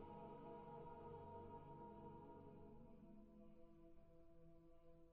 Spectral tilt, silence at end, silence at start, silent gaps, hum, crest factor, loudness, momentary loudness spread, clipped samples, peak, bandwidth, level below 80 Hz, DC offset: -8 dB/octave; 0 s; 0 s; none; none; 14 dB; -61 LUFS; 10 LU; under 0.1%; -46 dBFS; 4.2 kHz; -72 dBFS; under 0.1%